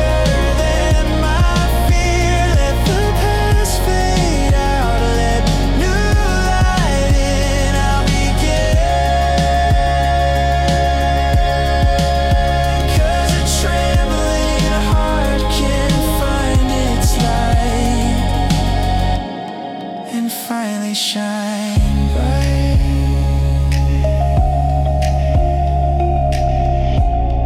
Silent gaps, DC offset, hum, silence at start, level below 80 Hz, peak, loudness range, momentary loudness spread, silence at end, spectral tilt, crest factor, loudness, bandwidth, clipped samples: none; under 0.1%; none; 0 s; -18 dBFS; -4 dBFS; 3 LU; 2 LU; 0 s; -5.5 dB/octave; 10 dB; -16 LUFS; 16 kHz; under 0.1%